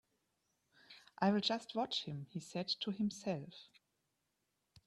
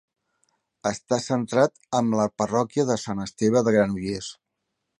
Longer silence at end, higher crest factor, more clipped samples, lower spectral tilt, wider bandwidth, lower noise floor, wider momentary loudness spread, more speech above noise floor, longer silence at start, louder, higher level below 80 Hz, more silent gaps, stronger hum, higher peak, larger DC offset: first, 1.25 s vs 0.65 s; about the same, 22 dB vs 20 dB; neither; about the same, -5 dB/octave vs -5.5 dB/octave; about the same, 11.5 kHz vs 11 kHz; first, -85 dBFS vs -80 dBFS; first, 23 LU vs 9 LU; second, 46 dB vs 56 dB; about the same, 0.9 s vs 0.85 s; second, -39 LUFS vs -24 LUFS; second, -80 dBFS vs -58 dBFS; neither; neither; second, -20 dBFS vs -4 dBFS; neither